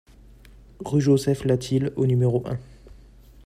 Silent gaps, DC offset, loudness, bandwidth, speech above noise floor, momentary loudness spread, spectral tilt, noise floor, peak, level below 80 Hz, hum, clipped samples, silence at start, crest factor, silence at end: none; under 0.1%; -23 LUFS; 14 kHz; 27 dB; 13 LU; -7.5 dB/octave; -49 dBFS; -8 dBFS; -50 dBFS; none; under 0.1%; 0.8 s; 16 dB; 0.55 s